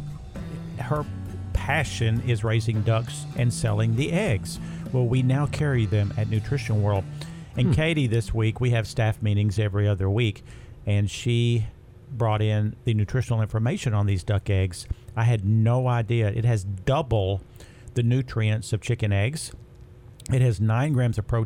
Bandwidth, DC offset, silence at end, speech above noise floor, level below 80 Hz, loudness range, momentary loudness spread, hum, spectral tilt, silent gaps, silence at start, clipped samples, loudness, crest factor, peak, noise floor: 12.5 kHz; under 0.1%; 0 s; 23 dB; -42 dBFS; 2 LU; 11 LU; none; -6.5 dB/octave; none; 0 s; under 0.1%; -25 LUFS; 14 dB; -10 dBFS; -46 dBFS